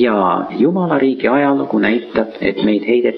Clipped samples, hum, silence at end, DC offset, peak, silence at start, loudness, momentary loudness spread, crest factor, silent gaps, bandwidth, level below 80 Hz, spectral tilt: under 0.1%; none; 0 s; under 0.1%; -2 dBFS; 0 s; -15 LUFS; 4 LU; 12 dB; none; 5.4 kHz; -52 dBFS; -9.5 dB/octave